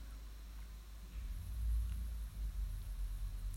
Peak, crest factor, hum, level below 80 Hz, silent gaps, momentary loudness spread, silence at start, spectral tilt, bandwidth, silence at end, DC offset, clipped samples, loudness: -30 dBFS; 12 dB; none; -42 dBFS; none; 12 LU; 0 s; -5.5 dB/octave; 16 kHz; 0 s; under 0.1%; under 0.1%; -46 LUFS